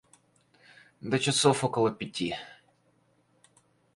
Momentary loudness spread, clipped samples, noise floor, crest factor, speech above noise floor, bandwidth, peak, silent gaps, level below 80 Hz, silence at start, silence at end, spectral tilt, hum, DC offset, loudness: 17 LU; under 0.1%; -68 dBFS; 22 dB; 41 dB; 11.5 kHz; -10 dBFS; none; -66 dBFS; 1.05 s; 1.4 s; -4 dB/octave; none; under 0.1%; -28 LUFS